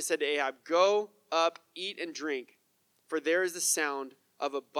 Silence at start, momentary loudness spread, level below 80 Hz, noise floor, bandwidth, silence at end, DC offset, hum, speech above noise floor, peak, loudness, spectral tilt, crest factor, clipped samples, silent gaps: 0 s; 11 LU; under -90 dBFS; -72 dBFS; 19.5 kHz; 0 s; under 0.1%; none; 42 dB; -14 dBFS; -31 LUFS; -0.5 dB/octave; 18 dB; under 0.1%; none